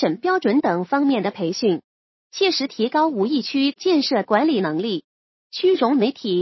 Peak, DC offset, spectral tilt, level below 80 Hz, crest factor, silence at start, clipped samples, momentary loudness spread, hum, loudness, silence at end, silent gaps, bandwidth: -2 dBFS; under 0.1%; -5.5 dB/octave; -76 dBFS; 18 dB; 0 s; under 0.1%; 6 LU; none; -20 LUFS; 0 s; 1.84-2.30 s, 5.04-5.50 s; 6.2 kHz